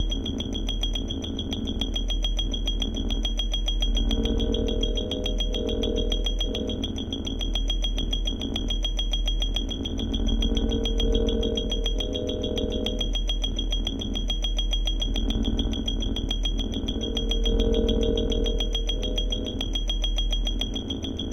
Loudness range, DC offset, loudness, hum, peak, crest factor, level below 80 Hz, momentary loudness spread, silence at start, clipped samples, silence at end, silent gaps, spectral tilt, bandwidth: 2 LU; under 0.1%; -27 LUFS; none; -10 dBFS; 16 dB; -28 dBFS; 4 LU; 0 s; under 0.1%; 0 s; none; -5 dB/octave; 6.6 kHz